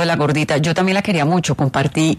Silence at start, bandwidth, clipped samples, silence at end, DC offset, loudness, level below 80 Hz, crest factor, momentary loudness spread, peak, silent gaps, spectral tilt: 0 s; 13.5 kHz; under 0.1%; 0 s; under 0.1%; -17 LUFS; -48 dBFS; 12 dB; 1 LU; -4 dBFS; none; -5.5 dB/octave